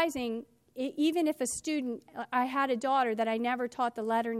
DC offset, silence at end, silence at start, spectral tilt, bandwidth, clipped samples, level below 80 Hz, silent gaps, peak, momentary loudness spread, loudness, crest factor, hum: under 0.1%; 0 s; 0 s; -3 dB/octave; 15.5 kHz; under 0.1%; -70 dBFS; none; -16 dBFS; 10 LU; -31 LUFS; 16 dB; none